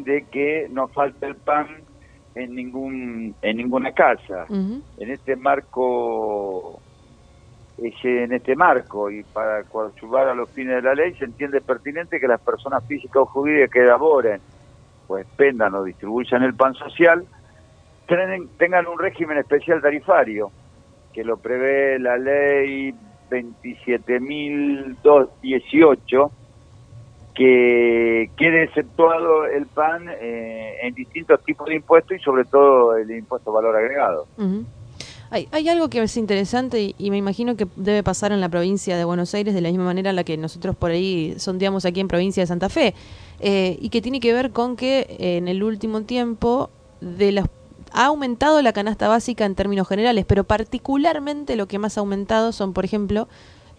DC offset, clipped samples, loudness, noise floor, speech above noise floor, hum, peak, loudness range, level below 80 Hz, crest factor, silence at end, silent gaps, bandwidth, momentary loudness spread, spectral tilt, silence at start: under 0.1%; under 0.1%; -20 LUFS; -50 dBFS; 30 dB; none; 0 dBFS; 5 LU; -46 dBFS; 20 dB; 0.55 s; none; 10.5 kHz; 13 LU; -6 dB/octave; 0 s